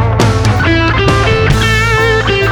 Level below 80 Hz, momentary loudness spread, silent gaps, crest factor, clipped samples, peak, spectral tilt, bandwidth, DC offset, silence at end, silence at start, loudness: -20 dBFS; 1 LU; none; 10 dB; under 0.1%; 0 dBFS; -5.5 dB/octave; 14.5 kHz; under 0.1%; 0 s; 0 s; -10 LUFS